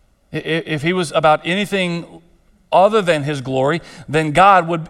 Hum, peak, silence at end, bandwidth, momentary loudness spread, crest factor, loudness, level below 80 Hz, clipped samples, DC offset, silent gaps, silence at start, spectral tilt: none; 0 dBFS; 0 s; 14 kHz; 11 LU; 16 dB; -16 LUFS; -50 dBFS; under 0.1%; under 0.1%; none; 0.3 s; -5.5 dB/octave